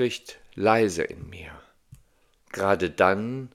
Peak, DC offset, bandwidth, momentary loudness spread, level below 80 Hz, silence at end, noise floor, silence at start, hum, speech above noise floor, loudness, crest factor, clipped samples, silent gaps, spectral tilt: -4 dBFS; under 0.1%; 15 kHz; 20 LU; -58 dBFS; 0.1 s; -62 dBFS; 0 s; none; 38 dB; -24 LUFS; 22 dB; under 0.1%; none; -5 dB/octave